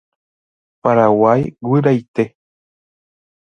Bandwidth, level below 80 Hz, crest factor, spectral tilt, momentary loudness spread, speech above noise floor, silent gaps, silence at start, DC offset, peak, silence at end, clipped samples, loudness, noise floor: 7 kHz; -56 dBFS; 18 dB; -9.5 dB/octave; 10 LU; over 76 dB; 2.08-2.14 s; 0.85 s; under 0.1%; 0 dBFS; 1.15 s; under 0.1%; -15 LUFS; under -90 dBFS